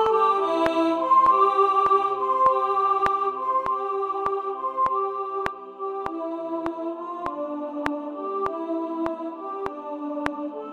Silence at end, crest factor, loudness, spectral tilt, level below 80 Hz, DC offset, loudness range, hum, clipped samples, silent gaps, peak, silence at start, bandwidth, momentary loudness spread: 0 s; 22 dB; -24 LUFS; -5.5 dB/octave; -58 dBFS; under 0.1%; 9 LU; none; under 0.1%; none; -2 dBFS; 0 s; 11 kHz; 13 LU